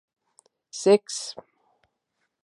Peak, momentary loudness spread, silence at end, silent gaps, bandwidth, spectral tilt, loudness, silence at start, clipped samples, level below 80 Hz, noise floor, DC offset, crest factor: -6 dBFS; 20 LU; 1.1 s; none; 11.5 kHz; -4 dB/octave; -23 LUFS; 0.75 s; under 0.1%; -82 dBFS; -78 dBFS; under 0.1%; 22 dB